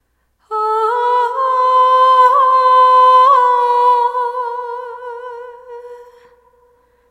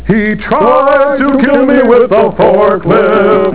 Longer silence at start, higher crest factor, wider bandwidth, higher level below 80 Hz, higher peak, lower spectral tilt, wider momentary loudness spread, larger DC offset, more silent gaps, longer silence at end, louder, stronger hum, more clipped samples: first, 0.5 s vs 0 s; about the same, 12 dB vs 8 dB; first, 10.5 kHz vs 4 kHz; second, -66 dBFS vs -34 dBFS; about the same, 0 dBFS vs 0 dBFS; second, 0 dB/octave vs -10.5 dB/octave; first, 20 LU vs 3 LU; second, under 0.1% vs 3%; neither; first, 1.1 s vs 0 s; second, -11 LUFS vs -8 LUFS; neither; neither